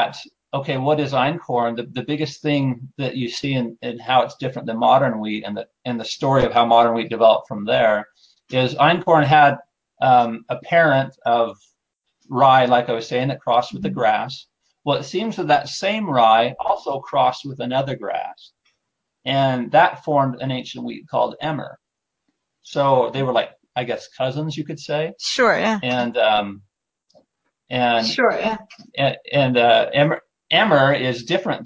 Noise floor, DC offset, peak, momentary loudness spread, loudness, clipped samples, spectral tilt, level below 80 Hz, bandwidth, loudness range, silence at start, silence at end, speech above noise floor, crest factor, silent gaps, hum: -77 dBFS; under 0.1%; -2 dBFS; 13 LU; -19 LUFS; under 0.1%; -5.5 dB/octave; -58 dBFS; 8 kHz; 6 LU; 0 s; 0 s; 58 dB; 18 dB; none; none